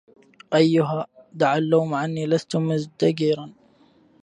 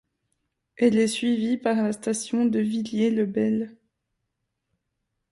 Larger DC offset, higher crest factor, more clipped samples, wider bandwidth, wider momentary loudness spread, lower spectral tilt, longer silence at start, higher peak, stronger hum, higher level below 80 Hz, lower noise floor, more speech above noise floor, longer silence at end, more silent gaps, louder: neither; about the same, 18 dB vs 18 dB; neither; second, 10 kHz vs 11.5 kHz; first, 9 LU vs 5 LU; first, -7 dB/octave vs -5 dB/octave; second, 0.5 s vs 0.8 s; first, -4 dBFS vs -8 dBFS; neither; about the same, -68 dBFS vs -68 dBFS; second, -57 dBFS vs -80 dBFS; second, 36 dB vs 56 dB; second, 0.7 s vs 1.6 s; neither; about the same, -22 LUFS vs -24 LUFS